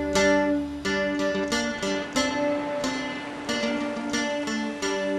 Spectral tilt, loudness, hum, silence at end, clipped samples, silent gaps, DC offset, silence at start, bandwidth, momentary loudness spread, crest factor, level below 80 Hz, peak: -3.5 dB/octave; -26 LUFS; none; 0 s; under 0.1%; none; under 0.1%; 0 s; 13.5 kHz; 7 LU; 18 dB; -50 dBFS; -10 dBFS